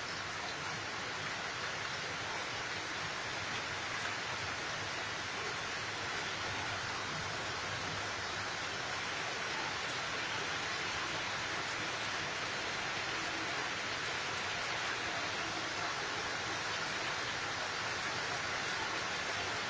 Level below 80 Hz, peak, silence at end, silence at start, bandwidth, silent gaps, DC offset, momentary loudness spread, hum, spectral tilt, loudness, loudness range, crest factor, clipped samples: -64 dBFS; -24 dBFS; 0 s; 0 s; 8 kHz; none; under 0.1%; 2 LU; none; -2 dB/octave; -37 LUFS; 2 LU; 16 dB; under 0.1%